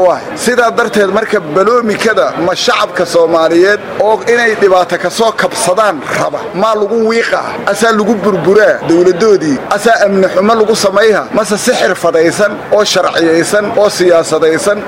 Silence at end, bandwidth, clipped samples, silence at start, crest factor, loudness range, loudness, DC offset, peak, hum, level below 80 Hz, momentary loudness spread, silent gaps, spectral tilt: 0 s; 16.5 kHz; 0.3%; 0 s; 10 dB; 2 LU; -10 LUFS; under 0.1%; 0 dBFS; none; -48 dBFS; 4 LU; none; -4 dB/octave